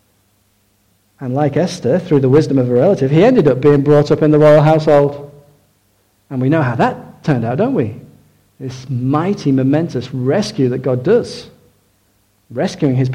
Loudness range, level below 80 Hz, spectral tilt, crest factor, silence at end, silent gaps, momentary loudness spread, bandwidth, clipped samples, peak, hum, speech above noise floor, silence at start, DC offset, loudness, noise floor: 7 LU; -48 dBFS; -8 dB/octave; 12 dB; 0 s; none; 14 LU; 10.5 kHz; under 0.1%; -2 dBFS; none; 45 dB; 1.2 s; under 0.1%; -14 LUFS; -58 dBFS